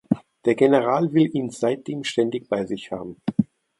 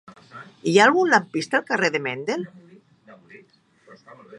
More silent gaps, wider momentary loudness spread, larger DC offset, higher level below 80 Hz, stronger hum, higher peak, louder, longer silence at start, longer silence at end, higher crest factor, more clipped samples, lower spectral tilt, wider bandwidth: neither; second, 11 LU vs 20 LU; neither; first, -62 dBFS vs -76 dBFS; neither; about the same, -4 dBFS vs -2 dBFS; second, -23 LUFS vs -20 LUFS; second, 0.1 s vs 0.35 s; first, 0.35 s vs 0 s; about the same, 18 dB vs 22 dB; neither; first, -6.5 dB/octave vs -4 dB/octave; about the same, 11.5 kHz vs 11.5 kHz